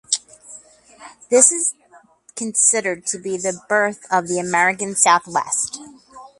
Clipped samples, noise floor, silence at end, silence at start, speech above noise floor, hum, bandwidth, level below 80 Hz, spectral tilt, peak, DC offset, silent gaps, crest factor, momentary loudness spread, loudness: under 0.1%; -50 dBFS; 0.1 s; 0.1 s; 31 dB; none; 12 kHz; -66 dBFS; -1.5 dB/octave; 0 dBFS; under 0.1%; none; 20 dB; 11 LU; -18 LUFS